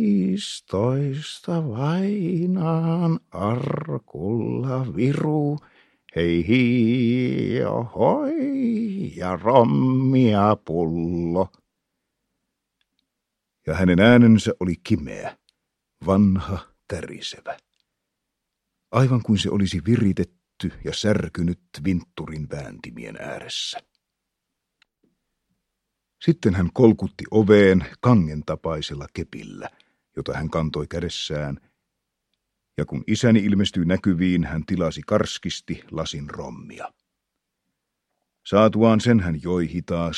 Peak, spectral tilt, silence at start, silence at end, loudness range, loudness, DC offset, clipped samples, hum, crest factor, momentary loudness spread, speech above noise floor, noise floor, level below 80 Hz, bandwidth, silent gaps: 0 dBFS; -7 dB/octave; 0 s; 0 s; 10 LU; -22 LUFS; under 0.1%; under 0.1%; none; 22 dB; 16 LU; 60 dB; -81 dBFS; -48 dBFS; 11 kHz; none